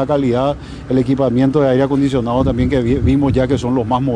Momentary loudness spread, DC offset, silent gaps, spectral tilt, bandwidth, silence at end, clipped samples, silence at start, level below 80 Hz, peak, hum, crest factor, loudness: 4 LU; under 0.1%; none; -8 dB/octave; 10 kHz; 0 s; under 0.1%; 0 s; -30 dBFS; -4 dBFS; none; 12 dB; -15 LUFS